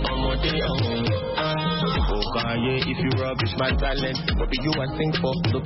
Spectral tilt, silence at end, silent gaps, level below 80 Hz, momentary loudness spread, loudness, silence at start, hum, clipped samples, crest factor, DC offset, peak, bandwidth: -9 dB/octave; 0 s; none; -30 dBFS; 2 LU; -24 LUFS; 0 s; none; under 0.1%; 16 dB; under 0.1%; -6 dBFS; 6 kHz